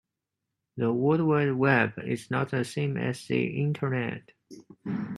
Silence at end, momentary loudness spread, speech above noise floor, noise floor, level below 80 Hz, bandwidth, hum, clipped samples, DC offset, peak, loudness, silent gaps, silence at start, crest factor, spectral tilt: 0 s; 12 LU; 58 dB; -85 dBFS; -68 dBFS; 12.5 kHz; none; under 0.1%; under 0.1%; -6 dBFS; -27 LUFS; none; 0.75 s; 22 dB; -7 dB/octave